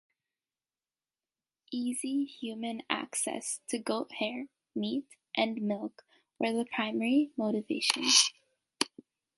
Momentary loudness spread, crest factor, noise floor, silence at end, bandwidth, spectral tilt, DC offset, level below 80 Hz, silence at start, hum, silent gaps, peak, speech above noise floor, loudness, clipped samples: 12 LU; 28 dB; under -90 dBFS; 0.5 s; 12 kHz; -2 dB/octave; under 0.1%; -84 dBFS; 1.7 s; none; none; -4 dBFS; over 58 dB; -31 LUFS; under 0.1%